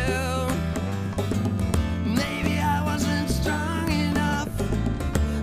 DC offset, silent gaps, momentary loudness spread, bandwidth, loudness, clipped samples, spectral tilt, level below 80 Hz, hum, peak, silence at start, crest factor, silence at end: under 0.1%; none; 3 LU; 15.5 kHz; -25 LUFS; under 0.1%; -5.5 dB/octave; -32 dBFS; none; -8 dBFS; 0 s; 16 dB; 0 s